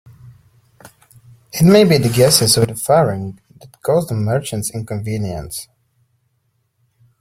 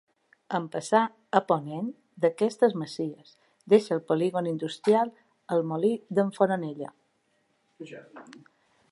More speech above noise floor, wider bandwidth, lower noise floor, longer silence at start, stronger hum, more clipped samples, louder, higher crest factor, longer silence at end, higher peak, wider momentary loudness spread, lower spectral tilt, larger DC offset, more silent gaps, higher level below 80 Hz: first, 51 dB vs 45 dB; first, 16.5 kHz vs 11.5 kHz; second, -66 dBFS vs -71 dBFS; second, 0.25 s vs 0.5 s; neither; neither; first, -15 LUFS vs -27 LUFS; about the same, 18 dB vs 22 dB; first, 1.55 s vs 0.6 s; first, 0 dBFS vs -6 dBFS; about the same, 16 LU vs 17 LU; second, -5 dB/octave vs -6.5 dB/octave; neither; neither; first, -46 dBFS vs -80 dBFS